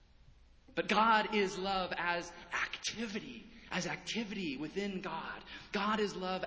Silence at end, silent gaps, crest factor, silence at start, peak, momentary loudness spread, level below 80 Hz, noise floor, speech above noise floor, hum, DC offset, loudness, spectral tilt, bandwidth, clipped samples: 0 s; none; 22 dB; 0.7 s; -16 dBFS; 13 LU; -64 dBFS; -61 dBFS; 25 dB; none; under 0.1%; -35 LUFS; -4 dB/octave; 8 kHz; under 0.1%